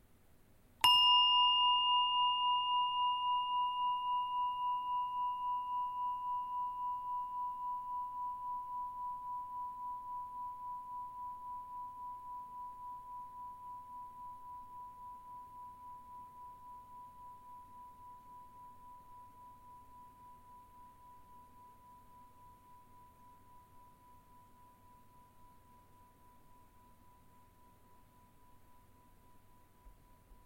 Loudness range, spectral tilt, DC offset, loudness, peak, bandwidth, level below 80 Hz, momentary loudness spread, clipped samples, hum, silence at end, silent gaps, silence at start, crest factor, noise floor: 27 LU; 0 dB/octave; under 0.1%; -35 LUFS; -16 dBFS; 16 kHz; -70 dBFS; 27 LU; under 0.1%; none; 0.1 s; none; 0.8 s; 24 dB; -64 dBFS